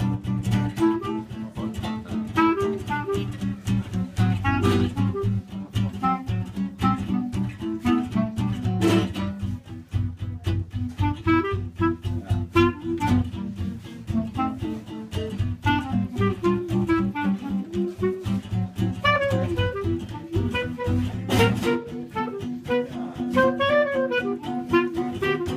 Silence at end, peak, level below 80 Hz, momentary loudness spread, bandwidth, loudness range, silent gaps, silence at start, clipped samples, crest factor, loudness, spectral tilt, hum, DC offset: 0 s; -6 dBFS; -42 dBFS; 10 LU; 15.5 kHz; 2 LU; none; 0 s; under 0.1%; 18 dB; -25 LUFS; -7 dB/octave; none; under 0.1%